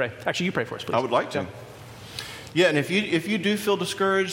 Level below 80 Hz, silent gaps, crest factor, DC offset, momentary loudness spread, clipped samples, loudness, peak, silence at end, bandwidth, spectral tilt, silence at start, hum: -62 dBFS; none; 18 dB; under 0.1%; 16 LU; under 0.1%; -24 LUFS; -6 dBFS; 0 s; 16.5 kHz; -4.5 dB/octave; 0 s; none